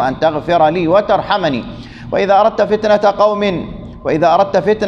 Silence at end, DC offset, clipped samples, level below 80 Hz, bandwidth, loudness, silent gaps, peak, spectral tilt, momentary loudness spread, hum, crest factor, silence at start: 0 s; under 0.1%; under 0.1%; -40 dBFS; 7.2 kHz; -13 LUFS; none; 0 dBFS; -6.5 dB/octave; 12 LU; none; 12 dB; 0 s